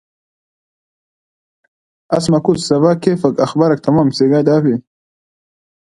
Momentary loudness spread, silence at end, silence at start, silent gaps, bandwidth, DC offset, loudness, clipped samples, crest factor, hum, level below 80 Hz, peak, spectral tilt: 5 LU; 1.15 s; 2.1 s; none; 11.5 kHz; under 0.1%; -14 LUFS; under 0.1%; 16 dB; none; -54 dBFS; 0 dBFS; -7 dB/octave